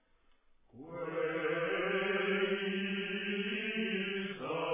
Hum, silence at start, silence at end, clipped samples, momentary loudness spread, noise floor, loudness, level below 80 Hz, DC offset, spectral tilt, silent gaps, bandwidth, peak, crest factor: none; 0.75 s; 0 s; under 0.1%; 7 LU; -68 dBFS; -35 LUFS; -76 dBFS; under 0.1%; -3 dB/octave; none; 3.8 kHz; -22 dBFS; 14 dB